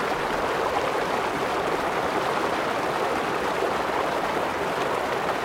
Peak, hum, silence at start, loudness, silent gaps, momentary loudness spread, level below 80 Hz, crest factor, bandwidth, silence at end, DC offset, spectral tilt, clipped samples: -10 dBFS; none; 0 s; -25 LUFS; none; 1 LU; -52 dBFS; 14 dB; 16.5 kHz; 0 s; under 0.1%; -4 dB/octave; under 0.1%